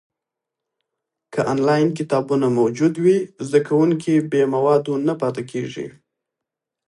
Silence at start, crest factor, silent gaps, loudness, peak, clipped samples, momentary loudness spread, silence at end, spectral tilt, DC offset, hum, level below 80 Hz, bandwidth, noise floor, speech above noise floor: 1.3 s; 16 dB; none; -19 LUFS; -4 dBFS; under 0.1%; 10 LU; 1 s; -7 dB/octave; under 0.1%; none; -68 dBFS; 11.5 kHz; -84 dBFS; 66 dB